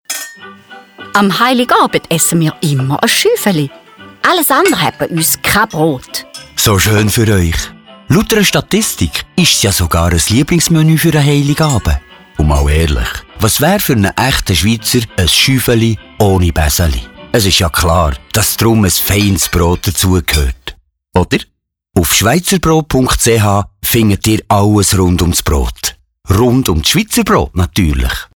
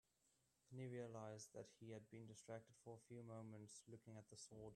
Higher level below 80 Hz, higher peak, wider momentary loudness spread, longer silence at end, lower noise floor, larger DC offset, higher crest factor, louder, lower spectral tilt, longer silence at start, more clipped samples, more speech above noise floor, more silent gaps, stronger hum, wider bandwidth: first, -24 dBFS vs -88 dBFS; first, 0 dBFS vs -40 dBFS; about the same, 7 LU vs 8 LU; about the same, 0.1 s vs 0 s; second, -36 dBFS vs -85 dBFS; first, 0.1% vs under 0.1%; second, 10 dB vs 18 dB; first, -11 LUFS vs -59 LUFS; second, -4 dB/octave vs -5.5 dB/octave; second, 0.1 s vs 0.25 s; neither; about the same, 25 dB vs 26 dB; neither; neither; first, over 20 kHz vs 12.5 kHz